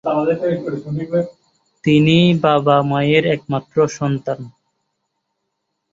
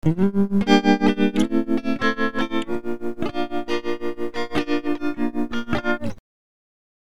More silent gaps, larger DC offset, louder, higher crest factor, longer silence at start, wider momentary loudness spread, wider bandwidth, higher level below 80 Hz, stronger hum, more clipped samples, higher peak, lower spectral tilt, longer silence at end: neither; second, under 0.1% vs 4%; first, -17 LUFS vs -23 LUFS; about the same, 16 dB vs 20 dB; about the same, 0.05 s vs 0 s; about the same, 12 LU vs 10 LU; second, 7.8 kHz vs 12.5 kHz; second, -54 dBFS vs -46 dBFS; neither; neither; about the same, -2 dBFS vs -2 dBFS; about the same, -7 dB/octave vs -6.5 dB/octave; first, 1.45 s vs 0.8 s